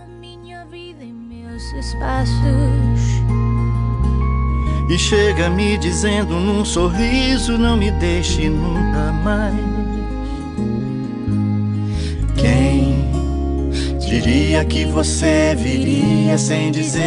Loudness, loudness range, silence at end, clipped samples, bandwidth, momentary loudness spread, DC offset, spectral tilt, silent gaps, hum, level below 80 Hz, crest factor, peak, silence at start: -18 LUFS; 4 LU; 0 s; under 0.1%; 11 kHz; 11 LU; under 0.1%; -5.5 dB/octave; none; none; -24 dBFS; 14 dB; -4 dBFS; 0 s